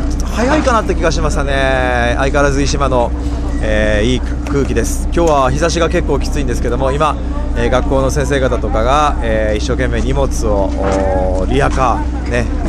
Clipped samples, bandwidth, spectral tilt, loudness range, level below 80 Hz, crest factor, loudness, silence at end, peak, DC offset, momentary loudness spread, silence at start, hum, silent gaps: under 0.1%; 13 kHz; -5.5 dB/octave; 1 LU; -18 dBFS; 14 dB; -15 LUFS; 0 s; 0 dBFS; under 0.1%; 5 LU; 0 s; none; none